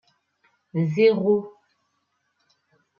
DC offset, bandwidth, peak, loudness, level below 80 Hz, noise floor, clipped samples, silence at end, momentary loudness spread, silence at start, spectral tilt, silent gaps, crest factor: under 0.1%; 6.8 kHz; -8 dBFS; -22 LUFS; -72 dBFS; -73 dBFS; under 0.1%; 1.5 s; 13 LU; 0.75 s; -8.5 dB/octave; none; 18 dB